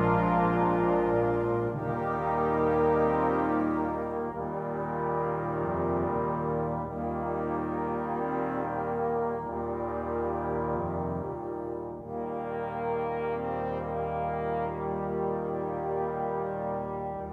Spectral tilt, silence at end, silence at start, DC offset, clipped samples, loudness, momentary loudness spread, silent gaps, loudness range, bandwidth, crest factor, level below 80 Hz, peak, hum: -10 dB/octave; 0 s; 0 s; under 0.1%; under 0.1%; -30 LUFS; 8 LU; none; 6 LU; 5.4 kHz; 16 dB; -50 dBFS; -14 dBFS; none